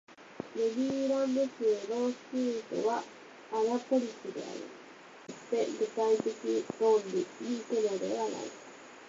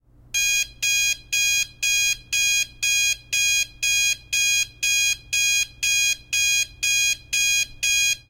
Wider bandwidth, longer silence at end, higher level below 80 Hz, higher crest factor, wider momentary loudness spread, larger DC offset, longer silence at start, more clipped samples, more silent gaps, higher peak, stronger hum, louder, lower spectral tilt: second, 7.8 kHz vs 16.5 kHz; about the same, 0 s vs 0.1 s; second, -78 dBFS vs -50 dBFS; about the same, 16 dB vs 12 dB; first, 18 LU vs 2 LU; neither; second, 0.1 s vs 0.35 s; neither; neither; second, -18 dBFS vs -10 dBFS; neither; second, -32 LUFS vs -19 LUFS; first, -4.5 dB/octave vs 3.5 dB/octave